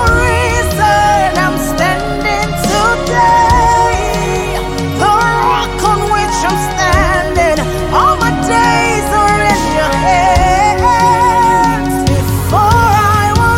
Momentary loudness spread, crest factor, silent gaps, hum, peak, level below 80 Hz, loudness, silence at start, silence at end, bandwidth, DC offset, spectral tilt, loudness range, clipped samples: 5 LU; 10 dB; none; none; 0 dBFS; -22 dBFS; -11 LUFS; 0 s; 0 s; 17 kHz; under 0.1%; -4.5 dB/octave; 2 LU; under 0.1%